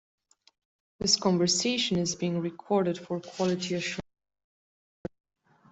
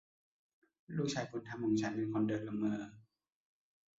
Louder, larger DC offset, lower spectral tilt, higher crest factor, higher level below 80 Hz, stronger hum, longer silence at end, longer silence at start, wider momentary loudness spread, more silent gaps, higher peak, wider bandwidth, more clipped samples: first, -28 LUFS vs -38 LUFS; neither; second, -4 dB/octave vs -6 dB/octave; first, 22 dB vs 16 dB; first, -64 dBFS vs -74 dBFS; neither; first, 1.7 s vs 0.95 s; about the same, 1 s vs 0.9 s; first, 17 LU vs 8 LU; neither; first, -10 dBFS vs -24 dBFS; first, 8.2 kHz vs 7.4 kHz; neither